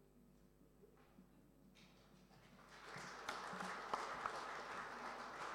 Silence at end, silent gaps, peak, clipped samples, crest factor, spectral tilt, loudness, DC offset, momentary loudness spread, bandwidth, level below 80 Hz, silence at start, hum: 0 s; none; -26 dBFS; under 0.1%; 26 dB; -3 dB/octave; -49 LUFS; under 0.1%; 22 LU; 16.5 kHz; -76 dBFS; 0 s; none